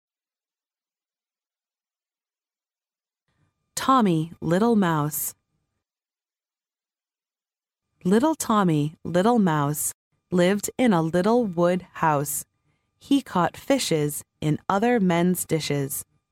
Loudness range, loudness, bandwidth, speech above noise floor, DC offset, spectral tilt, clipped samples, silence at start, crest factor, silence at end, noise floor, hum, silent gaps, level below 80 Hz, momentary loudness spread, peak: 6 LU; -23 LUFS; 17 kHz; over 68 dB; under 0.1%; -5.5 dB/octave; under 0.1%; 3.75 s; 20 dB; 0.3 s; under -90 dBFS; none; 9.94-10.11 s; -62 dBFS; 8 LU; -6 dBFS